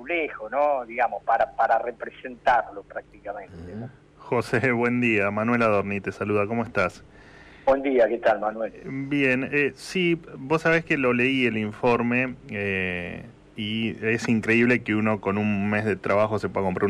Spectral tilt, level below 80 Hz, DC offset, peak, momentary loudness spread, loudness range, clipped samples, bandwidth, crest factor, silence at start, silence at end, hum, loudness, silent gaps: -6.5 dB/octave; -56 dBFS; under 0.1%; -12 dBFS; 15 LU; 3 LU; under 0.1%; 12.5 kHz; 14 dB; 0 s; 0 s; none; -24 LUFS; none